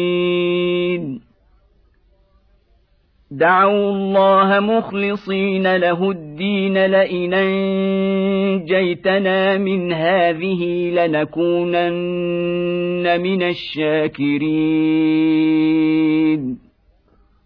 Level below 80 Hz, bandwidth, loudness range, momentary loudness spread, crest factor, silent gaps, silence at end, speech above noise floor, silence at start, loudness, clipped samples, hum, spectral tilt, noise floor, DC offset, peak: -56 dBFS; 5.4 kHz; 3 LU; 6 LU; 14 dB; none; 0.9 s; 41 dB; 0 s; -17 LUFS; under 0.1%; none; -9.5 dB/octave; -57 dBFS; under 0.1%; -4 dBFS